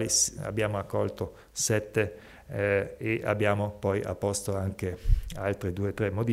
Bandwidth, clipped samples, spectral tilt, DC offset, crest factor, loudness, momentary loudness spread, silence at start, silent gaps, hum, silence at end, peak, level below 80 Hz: 16 kHz; under 0.1%; -4 dB/octave; under 0.1%; 18 dB; -30 LUFS; 7 LU; 0 s; none; none; 0 s; -10 dBFS; -38 dBFS